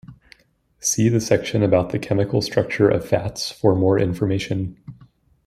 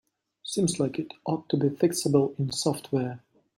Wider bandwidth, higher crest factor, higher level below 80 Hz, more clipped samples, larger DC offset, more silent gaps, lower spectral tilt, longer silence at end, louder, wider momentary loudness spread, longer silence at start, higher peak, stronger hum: about the same, 15.5 kHz vs 16 kHz; about the same, 18 dB vs 18 dB; first, -50 dBFS vs -66 dBFS; neither; neither; neither; about the same, -5.5 dB/octave vs -5.5 dB/octave; first, 0.55 s vs 0.4 s; first, -20 LUFS vs -27 LUFS; second, 7 LU vs 10 LU; second, 0.1 s vs 0.45 s; first, -2 dBFS vs -8 dBFS; neither